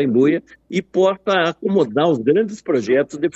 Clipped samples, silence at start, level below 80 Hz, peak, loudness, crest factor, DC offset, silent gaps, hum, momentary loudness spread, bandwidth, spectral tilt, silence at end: under 0.1%; 0 s; -62 dBFS; -4 dBFS; -18 LUFS; 14 dB; under 0.1%; none; none; 6 LU; 8.2 kHz; -6.5 dB/octave; 0.05 s